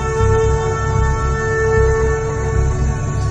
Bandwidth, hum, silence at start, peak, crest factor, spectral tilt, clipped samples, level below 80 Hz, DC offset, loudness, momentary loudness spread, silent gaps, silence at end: 9 kHz; none; 0 s; -2 dBFS; 12 dB; -6.5 dB/octave; under 0.1%; -20 dBFS; under 0.1%; -17 LUFS; 5 LU; none; 0 s